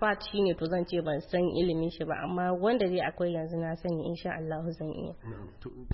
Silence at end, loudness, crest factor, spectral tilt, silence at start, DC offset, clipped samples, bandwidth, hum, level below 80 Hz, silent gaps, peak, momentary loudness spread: 0 s; -31 LUFS; 16 dB; -10.5 dB/octave; 0 s; under 0.1%; under 0.1%; 5.8 kHz; none; -52 dBFS; none; -16 dBFS; 12 LU